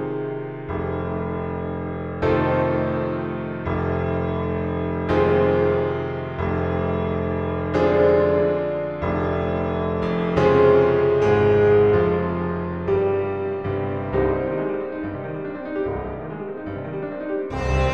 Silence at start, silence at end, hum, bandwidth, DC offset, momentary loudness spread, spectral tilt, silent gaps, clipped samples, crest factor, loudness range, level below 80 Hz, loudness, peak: 0 s; 0 s; none; 6.6 kHz; 0.3%; 12 LU; -8.5 dB/octave; none; under 0.1%; 18 dB; 8 LU; -38 dBFS; -22 LUFS; -4 dBFS